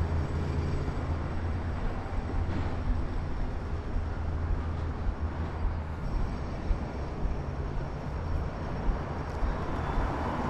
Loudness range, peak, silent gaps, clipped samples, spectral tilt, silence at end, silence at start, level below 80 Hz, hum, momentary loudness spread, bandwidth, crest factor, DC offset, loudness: 2 LU; -14 dBFS; none; under 0.1%; -8 dB/octave; 0 s; 0 s; -34 dBFS; none; 4 LU; 8.4 kHz; 16 dB; under 0.1%; -34 LUFS